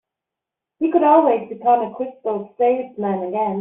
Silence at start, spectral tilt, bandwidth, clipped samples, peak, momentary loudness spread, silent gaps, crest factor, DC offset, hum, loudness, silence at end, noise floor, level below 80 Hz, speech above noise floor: 0.8 s; -6.5 dB/octave; 3.9 kHz; under 0.1%; -2 dBFS; 12 LU; none; 18 dB; under 0.1%; none; -19 LUFS; 0 s; -85 dBFS; -68 dBFS; 67 dB